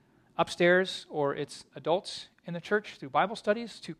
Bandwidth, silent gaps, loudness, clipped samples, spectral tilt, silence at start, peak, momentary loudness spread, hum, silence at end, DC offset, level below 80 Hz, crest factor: 12.5 kHz; none; -30 LUFS; under 0.1%; -5 dB/octave; 0.4 s; -12 dBFS; 16 LU; none; 0.05 s; under 0.1%; -72 dBFS; 20 dB